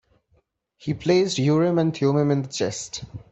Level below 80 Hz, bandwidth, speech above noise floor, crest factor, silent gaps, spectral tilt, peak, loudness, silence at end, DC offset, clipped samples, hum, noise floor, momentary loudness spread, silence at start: -58 dBFS; 8.4 kHz; 44 dB; 16 dB; none; -6 dB/octave; -8 dBFS; -22 LUFS; 0.1 s; under 0.1%; under 0.1%; none; -66 dBFS; 13 LU; 0.85 s